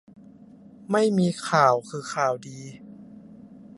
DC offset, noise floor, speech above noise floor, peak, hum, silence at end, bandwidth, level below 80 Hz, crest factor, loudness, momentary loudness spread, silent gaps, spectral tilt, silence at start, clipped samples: under 0.1%; -49 dBFS; 25 dB; -4 dBFS; none; 0.15 s; 11.5 kHz; -70 dBFS; 22 dB; -23 LUFS; 24 LU; none; -5.5 dB/octave; 0.9 s; under 0.1%